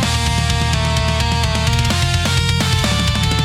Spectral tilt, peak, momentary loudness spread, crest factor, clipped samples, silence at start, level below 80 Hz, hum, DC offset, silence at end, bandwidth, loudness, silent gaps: -4 dB/octave; -4 dBFS; 1 LU; 12 dB; under 0.1%; 0 s; -24 dBFS; none; under 0.1%; 0 s; 16 kHz; -16 LUFS; none